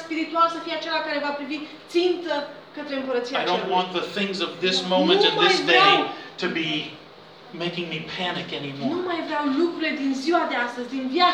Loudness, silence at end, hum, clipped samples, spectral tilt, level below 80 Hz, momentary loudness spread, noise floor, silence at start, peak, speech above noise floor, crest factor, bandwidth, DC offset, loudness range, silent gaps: -23 LUFS; 0 s; none; under 0.1%; -4 dB/octave; -74 dBFS; 13 LU; -45 dBFS; 0 s; -4 dBFS; 22 dB; 20 dB; 10.5 kHz; under 0.1%; 7 LU; none